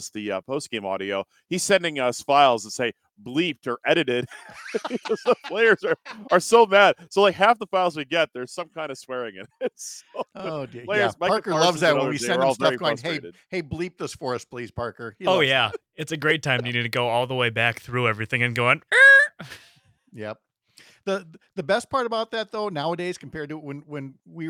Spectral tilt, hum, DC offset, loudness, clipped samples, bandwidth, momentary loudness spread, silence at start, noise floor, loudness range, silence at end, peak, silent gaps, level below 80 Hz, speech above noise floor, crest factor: -4 dB/octave; none; under 0.1%; -22 LUFS; under 0.1%; 16.5 kHz; 16 LU; 0 s; -55 dBFS; 9 LU; 0 s; -2 dBFS; none; -64 dBFS; 32 dB; 22 dB